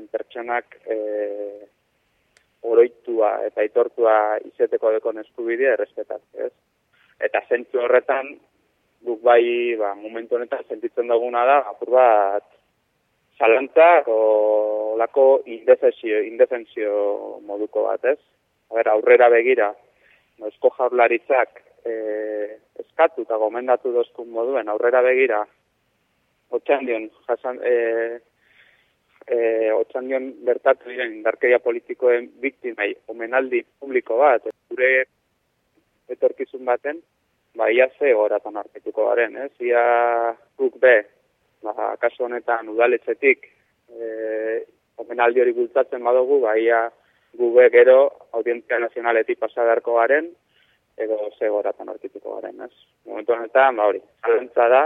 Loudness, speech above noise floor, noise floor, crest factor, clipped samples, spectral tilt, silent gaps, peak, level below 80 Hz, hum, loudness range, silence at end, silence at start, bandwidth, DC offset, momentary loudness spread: -20 LUFS; 50 dB; -69 dBFS; 18 dB; under 0.1%; -6 dB/octave; none; -2 dBFS; -76 dBFS; none; 6 LU; 0 s; 0 s; 3.9 kHz; under 0.1%; 14 LU